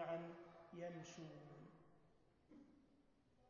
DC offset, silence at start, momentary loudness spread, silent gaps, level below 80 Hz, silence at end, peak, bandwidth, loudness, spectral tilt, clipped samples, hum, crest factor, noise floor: under 0.1%; 0 s; 17 LU; none; -84 dBFS; 0 s; -38 dBFS; 7 kHz; -55 LUFS; -5.5 dB/octave; under 0.1%; none; 18 dB; -76 dBFS